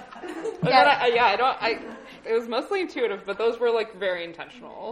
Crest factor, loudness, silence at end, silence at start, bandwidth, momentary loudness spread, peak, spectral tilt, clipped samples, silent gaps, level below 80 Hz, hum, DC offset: 20 dB; -23 LUFS; 0 s; 0 s; 11.5 kHz; 19 LU; -4 dBFS; -5 dB/octave; under 0.1%; none; -62 dBFS; none; under 0.1%